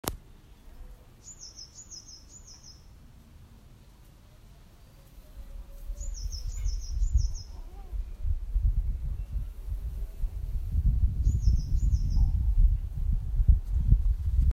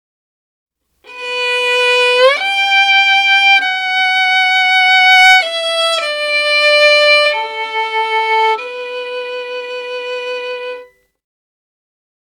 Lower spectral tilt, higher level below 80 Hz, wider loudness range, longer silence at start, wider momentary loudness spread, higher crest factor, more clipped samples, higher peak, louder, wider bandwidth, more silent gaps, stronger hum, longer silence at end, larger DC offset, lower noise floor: first, -6 dB/octave vs 3 dB/octave; first, -30 dBFS vs -68 dBFS; first, 21 LU vs 11 LU; second, 0.05 s vs 1.05 s; first, 21 LU vs 15 LU; first, 22 dB vs 14 dB; neither; second, -6 dBFS vs 0 dBFS; second, -31 LUFS vs -10 LUFS; second, 15 kHz vs 18 kHz; neither; neither; second, 0 s vs 1.4 s; neither; first, -53 dBFS vs -39 dBFS